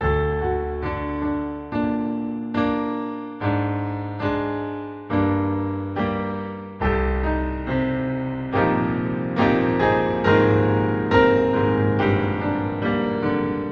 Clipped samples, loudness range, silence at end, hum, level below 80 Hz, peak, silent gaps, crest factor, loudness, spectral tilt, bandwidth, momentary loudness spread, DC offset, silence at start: under 0.1%; 6 LU; 0 s; none; -36 dBFS; -4 dBFS; none; 18 dB; -22 LUFS; -9 dB/octave; 6.6 kHz; 9 LU; under 0.1%; 0 s